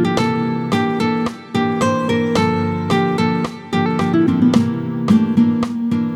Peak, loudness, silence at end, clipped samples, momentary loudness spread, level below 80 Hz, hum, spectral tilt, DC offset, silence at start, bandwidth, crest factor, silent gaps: 0 dBFS; -17 LUFS; 0 s; under 0.1%; 6 LU; -50 dBFS; none; -6.5 dB/octave; under 0.1%; 0 s; 12 kHz; 16 dB; none